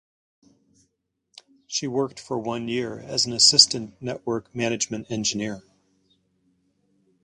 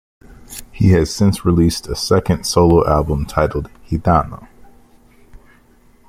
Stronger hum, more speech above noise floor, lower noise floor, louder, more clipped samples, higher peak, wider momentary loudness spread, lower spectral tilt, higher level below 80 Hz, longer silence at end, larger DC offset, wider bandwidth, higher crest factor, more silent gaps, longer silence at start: neither; first, 51 dB vs 35 dB; first, -75 dBFS vs -50 dBFS; second, -22 LUFS vs -16 LUFS; neither; about the same, 0 dBFS vs 0 dBFS; about the same, 16 LU vs 17 LU; second, -2 dB/octave vs -6.5 dB/octave; second, -64 dBFS vs -32 dBFS; about the same, 1.65 s vs 1.65 s; neither; second, 11.5 kHz vs 16 kHz; first, 26 dB vs 16 dB; neither; first, 1.7 s vs 0.4 s